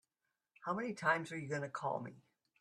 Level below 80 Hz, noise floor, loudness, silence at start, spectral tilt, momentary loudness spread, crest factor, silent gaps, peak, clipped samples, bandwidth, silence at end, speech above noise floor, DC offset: -82 dBFS; -89 dBFS; -39 LUFS; 0.6 s; -5.5 dB/octave; 10 LU; 22 dB; none; -18 dBFS; under 0.1%; 12.5 kHz; 0.4 s; 50 dB; under 0.1%